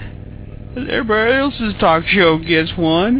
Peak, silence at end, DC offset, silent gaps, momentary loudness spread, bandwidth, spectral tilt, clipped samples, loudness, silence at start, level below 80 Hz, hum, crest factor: 0 dBFS; 0 s; under 0.1%; none; 21 LU; 4 kHz; -9 dB/octave; under 0.1%; -15 LUFS; 0 s; -36 dBFS; none; 16 dB